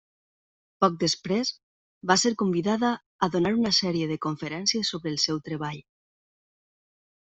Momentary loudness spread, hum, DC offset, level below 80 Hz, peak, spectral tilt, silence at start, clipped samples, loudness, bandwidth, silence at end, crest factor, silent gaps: 9 LU; none; under 0.1%; -64 dBFS; -4 dBFS; -4 dB/octave; 0.8 s; under 0.1%; -26 LUFS; 8.2 kHz; 1.4 s; 24 dB; 1.63-2.01 s, 3.06-3.19 s